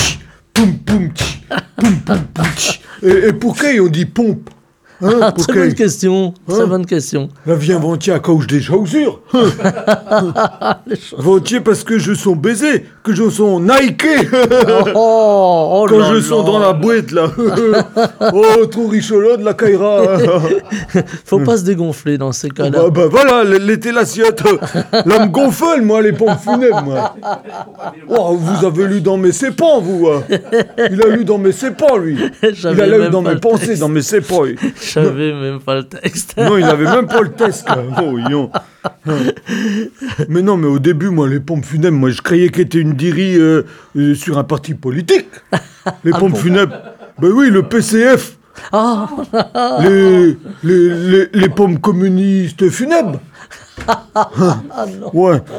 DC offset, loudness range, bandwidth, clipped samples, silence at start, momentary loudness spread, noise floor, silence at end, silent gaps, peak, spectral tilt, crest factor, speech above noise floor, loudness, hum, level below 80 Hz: under 0.1%; 4 LU; 18.5 kHz; under 0.1%; 0 s; 9 LU; -37 dBFS; 0 s; none; 0 dBFS; -6 dB/octave; 12 dB; 25 dB; -12 LUFS; none; -46 dBFS